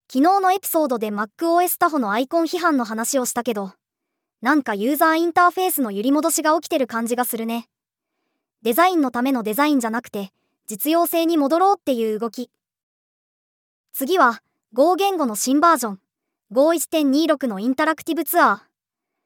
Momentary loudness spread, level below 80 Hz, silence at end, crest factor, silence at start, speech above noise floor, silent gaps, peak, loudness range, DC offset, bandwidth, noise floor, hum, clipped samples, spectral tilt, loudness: 11 LU; -78 dBFS; 0.65 s; 18 dB; 0.1 s; 63 dB; 12.83-13.84 s; -4 dBFS; 3 LU; under 0.1%; over 20 kHz; -83 dBFS; none; under 0.1%; -3.5 dB/octave; -20 LUFS